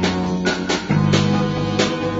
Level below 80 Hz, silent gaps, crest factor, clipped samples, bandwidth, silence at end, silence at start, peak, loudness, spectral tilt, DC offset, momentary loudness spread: -42 dBFS; none; 16 dB; under 0.1%; 8 kHz; 0 s; 0 s; -2 dBFS; -19 LUFS; -5.5 dB/octave; under 0.1%; 4 LU